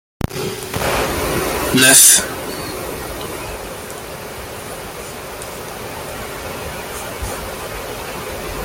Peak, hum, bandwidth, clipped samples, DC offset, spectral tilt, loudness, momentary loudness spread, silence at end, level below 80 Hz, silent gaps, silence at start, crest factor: 0 dBFS; none; 17 kHz; under 0.1%; under 0.1%; -2 dB/octave; -16 LUFS; 20 LU; 0 s; -38 dBFS; none; 0.2 s; 20 dB